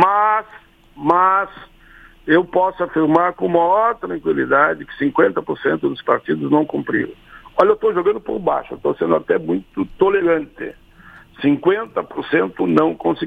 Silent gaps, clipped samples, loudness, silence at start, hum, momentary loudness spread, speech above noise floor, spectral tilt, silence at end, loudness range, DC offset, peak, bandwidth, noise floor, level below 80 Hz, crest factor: none; under 0.1%; -18 LUFS; 0 s; none; 8 LU; 28 dB; -8 dB/octave; 0 s; 3 LU; under 0.1%; 0 dBFS; 5.2 kHz; -45 dBFS; -50 dBFS; 18 dB